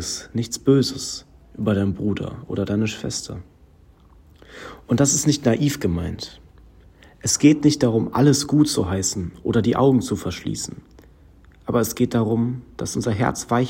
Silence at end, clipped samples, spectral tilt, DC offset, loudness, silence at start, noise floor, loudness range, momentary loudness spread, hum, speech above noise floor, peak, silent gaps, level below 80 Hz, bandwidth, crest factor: 0 s; under 0.1%; -5 dB/octave; under 0.1%; -21 LUFS; 0 s; -51 dBFS; 7 LU; 13 LU; none; 31 dB; -2 dBFS; none; -48 dBFS; 16.5 kHz; 20 dB